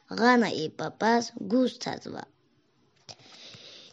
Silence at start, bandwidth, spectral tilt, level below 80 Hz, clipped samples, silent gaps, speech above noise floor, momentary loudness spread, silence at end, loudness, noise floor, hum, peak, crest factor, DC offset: 0.1 s; 8 kHz; -4.5 dB/octave; -80 dBFS; under 0.1%; none; 41 dB; 24 LU; 0.1 s; -27 LUFS; -68 dBFS; none; -8 dBFS; 22 dB; under 0.1%